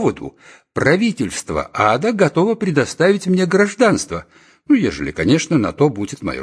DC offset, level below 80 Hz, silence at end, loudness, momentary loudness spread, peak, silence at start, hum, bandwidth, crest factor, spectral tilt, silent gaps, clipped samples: under 0.1%; -46 dBFS; 0 s; -17 LUFS; 10 LU; 0 dBFS; 0 s; none; 11 kHz; 16 dB; -5.5 dB/octave; none; under 0.1%